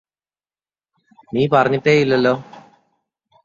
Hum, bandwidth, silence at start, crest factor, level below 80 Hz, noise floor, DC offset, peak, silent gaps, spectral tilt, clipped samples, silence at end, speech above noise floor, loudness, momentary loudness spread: none; 7.6 kHz; 1.35 s; 18 dB; -58 dBFS; under -90 dBFS; under 0.1%; -2 dBFS; none; -6.5 dB/octave; under 0.1%; 0.85 s; over 74 dB; -17 LUFS; 10 LU